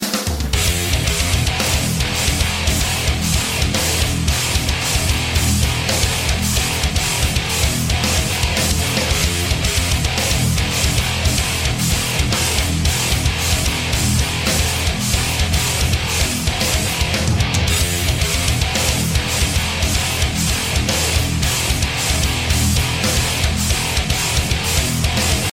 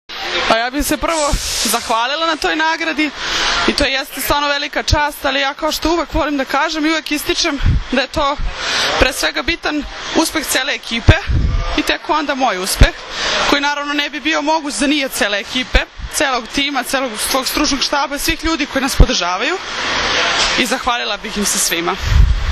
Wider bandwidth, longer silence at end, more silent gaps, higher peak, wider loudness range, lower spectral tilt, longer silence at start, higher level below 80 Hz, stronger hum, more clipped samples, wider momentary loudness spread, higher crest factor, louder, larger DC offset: first, 16.5 kHz vs 14 kHz; about the same, 0 s vs 0 s; neither; second, -4 dBFS vs 0 dBFS; about the same, 0 LU vs 1 LU; about the same, -3 dB/octave vs -3 dB/octave; about the same, 0 s vs 0.1 s; about the same, -24 dBFS vs -24 dBFS; neither; second, under 0.1% vs 0.1%; second, 1 LU vs 4 LU; about the same, 14 dB vs 16 dB; about the same, -17 LUFS vs -16 LUFS; neither